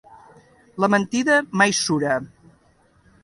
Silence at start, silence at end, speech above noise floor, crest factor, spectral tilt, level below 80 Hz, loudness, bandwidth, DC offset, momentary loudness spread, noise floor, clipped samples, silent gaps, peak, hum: 0.1 s; 0.95 s; 39 dB; 20 dB; -3.5 dB/octave; -62 dBFS; -20 LUFS; 11.5 kHz; under 0.1%; 7 LU; -58 dBFS; under 0.1%; none; -2 dBFS; none